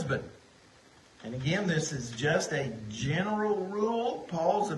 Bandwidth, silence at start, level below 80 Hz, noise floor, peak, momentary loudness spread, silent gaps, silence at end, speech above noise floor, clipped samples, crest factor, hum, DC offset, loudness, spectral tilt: 11.5 kHz; 0 s; -60 dBFS; -58 dBFS; -14 dBFS; 7 LU; none; 0 s; 28 dB; under 0.1%; 18 dB; none; under 0.1%; -31 LUFS; -5 dB/octave